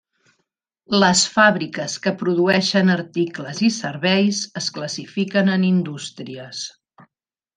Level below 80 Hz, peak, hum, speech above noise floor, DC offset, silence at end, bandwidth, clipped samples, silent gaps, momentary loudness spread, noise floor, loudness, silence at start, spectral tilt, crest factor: -64 dBFS; -2 dBFS; none; 62 dB; under 0.1%; 0.85 s; 9.6 kHz; under 0.1%; none; 15 LU; -82 dBFS; -19 LUFS; 0.9 s; -4 dB/octave; 20 dB